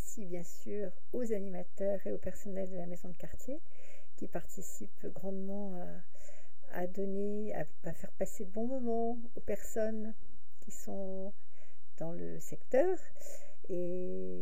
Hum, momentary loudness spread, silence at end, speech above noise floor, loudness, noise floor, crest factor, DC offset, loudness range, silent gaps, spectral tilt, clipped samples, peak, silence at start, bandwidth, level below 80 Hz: none; 14 LU; 0 s; 30 dB; -40 LUFS; -69 dBFS; 22 dB; 5%; 6 LU; none; -7 dB/octave; under 0.1%; -16 dBFS; 0 s; 16 kHz; -64 dBFS